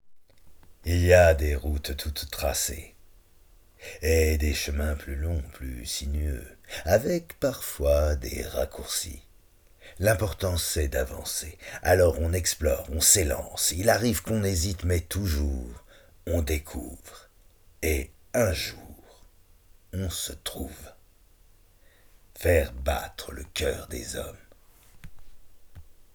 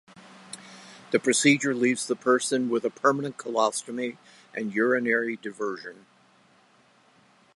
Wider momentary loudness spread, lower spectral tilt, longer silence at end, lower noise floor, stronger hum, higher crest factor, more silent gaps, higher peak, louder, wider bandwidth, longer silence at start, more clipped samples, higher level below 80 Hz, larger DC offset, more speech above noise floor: second, 17 LU vs 21 LU; about the same, -4 dB/octave vs -3.5 dB/octave; second, 0.15 s vs 1.6 s; about the same, -57 dBFS vs -60 dBFS; neither; about the same, 24 dB vs 22 dB; neither; about the same, -4 dBFS vs -6 dBFS; about the same, -26 LUFS vs -25 LUFS; first, over 20 kHz vs 11.5 kHz; about the same, 0.05 s vs 0.15 s; neither; first, -38 dBFS vs -80 dBFS; neither; second, 31 dB vs 35 dB